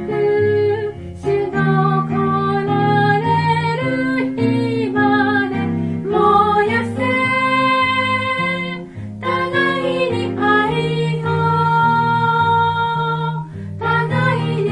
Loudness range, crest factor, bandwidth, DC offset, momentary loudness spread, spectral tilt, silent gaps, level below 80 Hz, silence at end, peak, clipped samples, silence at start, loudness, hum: 2 LU; 14 dB; 11 kHz; under 0.1%; 7 LU; -7.5 dB/octave; none; -50 dBFS; 0 s; -2 dBFS; under 0.1%; 0 s; -17 LUFS; none